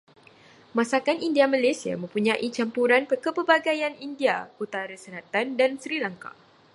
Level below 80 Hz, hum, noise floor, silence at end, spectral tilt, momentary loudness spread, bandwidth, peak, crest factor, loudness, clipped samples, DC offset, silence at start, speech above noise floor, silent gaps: -76 dBFS; none; -53 dBFS; 0.45 s; -4.5 dB/octave; 11 LU; 11.5 kHz; -4 dBFS; 22 dB; -25 LUFS; under 0.1%; under 0.1%; 0.75 s; 28 dB; none